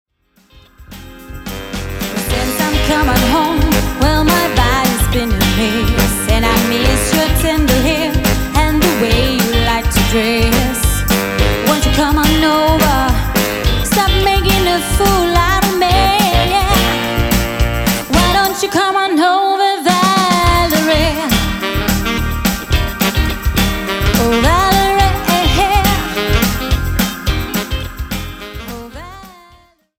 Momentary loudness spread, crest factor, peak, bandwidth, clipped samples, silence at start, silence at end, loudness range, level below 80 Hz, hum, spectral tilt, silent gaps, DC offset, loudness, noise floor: 8 LU; 12 dB; 0 dBFS; 17 kHz; under 0.1%; 0.8 s; 0.7 s; 3 LU; -20 dBFS; none; -4.5 dB/octave; none; under 0.1%; -13 LUFS; -52 dBFS